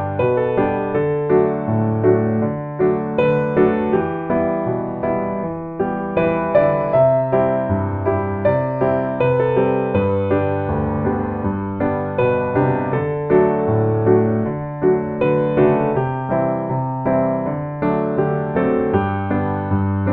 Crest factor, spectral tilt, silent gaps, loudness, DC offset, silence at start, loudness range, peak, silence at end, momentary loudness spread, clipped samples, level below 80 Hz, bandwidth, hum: 16 dB; -11.5 dB/octave; none; -19 LUFS; under 0.1%; 0 s; 2 LU; -2 dBFS; 0 s; 6 LU; under 0.1%; -44 dBFS; 4.3 kHz; none